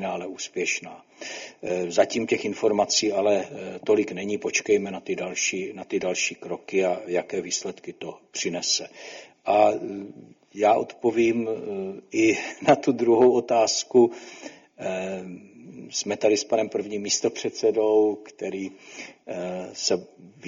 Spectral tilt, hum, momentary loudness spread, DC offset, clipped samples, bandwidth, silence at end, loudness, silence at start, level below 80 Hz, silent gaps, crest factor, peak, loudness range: -3 dB/octave; none; 17 LU; under 0.1%; under 0.1%; 7.6 kHz; 0 s; -24 LUFS; 0 s; -68 dBFS; none; 20 dB; -6 dBFS; 5 LU